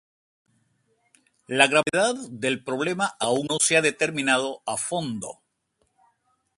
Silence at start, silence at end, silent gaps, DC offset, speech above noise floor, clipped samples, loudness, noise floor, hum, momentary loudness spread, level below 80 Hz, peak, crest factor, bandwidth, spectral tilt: 1.5 s; 1.25 s; none; under 0.1%; 48 dB; under 0.1%; -23 LUFS; -72 dBFS; none; 10 LU; -70 dBFS; -2 dBFS; 26 dB; 11.5 kHz; -2.5 dB/octave